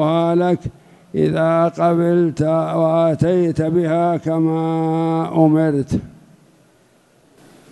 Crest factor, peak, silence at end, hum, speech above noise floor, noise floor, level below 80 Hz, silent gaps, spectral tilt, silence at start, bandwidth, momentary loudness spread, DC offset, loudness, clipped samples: 16 dB; -2 dBFS; 1.65 s; none; 38 dB; -54 dBFS; -48 dBFS; none; -8.5 dB/octave; 0 s; 11 kHz; 5 LU; under 0.1%; -17 LUFS; under 0.1%